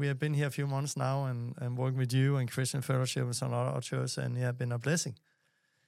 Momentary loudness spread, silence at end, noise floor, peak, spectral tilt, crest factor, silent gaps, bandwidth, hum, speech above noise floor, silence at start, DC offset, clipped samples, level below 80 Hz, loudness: 5 LU; 0.75 s; -75 dBFS; -18 dBFS; -5.5 dB/octave; 14 dB; none; 14.5 kHz; none; 43 dB; 0 s; under 0.1%; under 0.1%; -78 dBFS; -33 LUFS